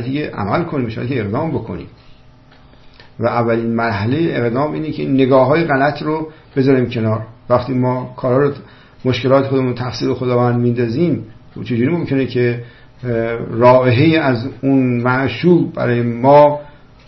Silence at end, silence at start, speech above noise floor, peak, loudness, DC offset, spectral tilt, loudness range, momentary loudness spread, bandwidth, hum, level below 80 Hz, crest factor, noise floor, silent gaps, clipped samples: 0.35 s; 0 s; 29 dB; 0 dBFS; -16 LUFS; under 0.1%; -8.5 dB/octave; 6 LU; 11 LU; 6.2 kHz; none; -46 dBFS; 16 dB; -44 dBFS; none; under 0.1%